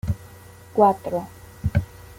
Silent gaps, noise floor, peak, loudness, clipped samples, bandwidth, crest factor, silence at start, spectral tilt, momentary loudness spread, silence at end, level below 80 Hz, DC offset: none; -45 dBFS; -4 dBFS; -24 LUFS; under 0.1%; 16.5 kHz; 20 dB; 0.05 s; -8 dB/octave; 13 LU; 0.05 s; -40 dBFS; under 0.1%